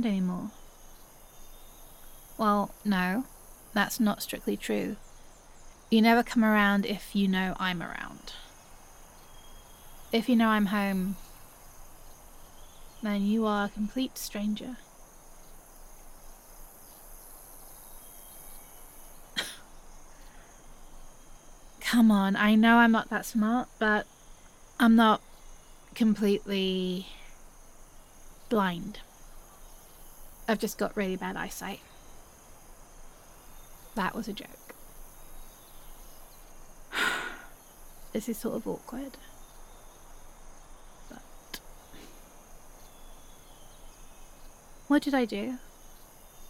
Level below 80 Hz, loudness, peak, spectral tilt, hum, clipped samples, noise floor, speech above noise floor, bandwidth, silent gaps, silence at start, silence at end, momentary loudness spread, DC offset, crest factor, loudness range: -52 dBFS; -28 LUFS; -10 dBFS; -5 dB/octave; none; under 0.1%; -52 dBFS; 25 dB; 16.5 kHz; none; 0 s; 0.05 s; 28 LU; under 0.1%; 22 dB; 23 LU